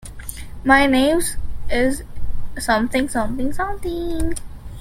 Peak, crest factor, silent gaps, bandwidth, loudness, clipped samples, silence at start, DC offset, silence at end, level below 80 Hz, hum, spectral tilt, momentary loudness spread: -2 dBFS; 18 dB; none; 16 kHz; -20 LUFS; under 0.1%; 0 s; under 0.1%; 0 s; -30 dBFS; none; -4 dB/octave; 19 LU